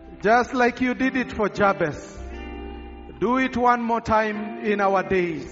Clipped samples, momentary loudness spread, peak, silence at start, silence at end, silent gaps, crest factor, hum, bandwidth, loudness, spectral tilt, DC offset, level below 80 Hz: under 0.1%; 17 LU; -4 dBFS; 0 s; 0 s; none; 18 dB; none; 7.6 kHz; -22 LUFS; -4.5 dB/octave; under 0.1%; -44 dBFS